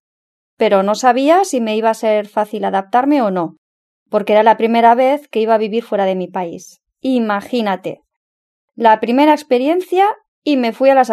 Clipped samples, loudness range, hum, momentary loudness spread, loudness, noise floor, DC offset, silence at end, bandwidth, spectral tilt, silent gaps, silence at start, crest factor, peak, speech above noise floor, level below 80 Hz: under 0.1%; 4 LU; none; 10 LU; -15 LUFS; under -90 dBFS; under 0.1%; 0 s; 13.5 kHz; -5 dB/octave; 3.58-4.06 s, 8.16-8.68 s, 10.28-10.42 s; 0.6 s; 14 dB; 0 dBFS; over 76 dB; -72 dBFS